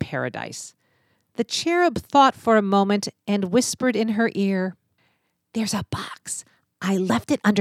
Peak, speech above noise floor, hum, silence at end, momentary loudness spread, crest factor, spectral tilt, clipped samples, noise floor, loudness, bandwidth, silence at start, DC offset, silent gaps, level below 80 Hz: -2 dBFS; 47 dB; none; 0 s; 15 LU; 20 dB; -4.5 dB/octave; under 0.1%; -69 dBFS; -22 LUFS; 15 kHz; 0 s; under 0.1%; none; -58 dBFS